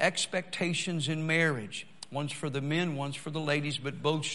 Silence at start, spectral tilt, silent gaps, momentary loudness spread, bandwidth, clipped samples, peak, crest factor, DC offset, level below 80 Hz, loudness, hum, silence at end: 0 s; -4.5 dB/octave; none; 9 LU; 11.5 kHz; under 0.1%; -10 dBFS; 22 dB; 0.3%; -72 dBFS; -31 LUFS; none; 0 s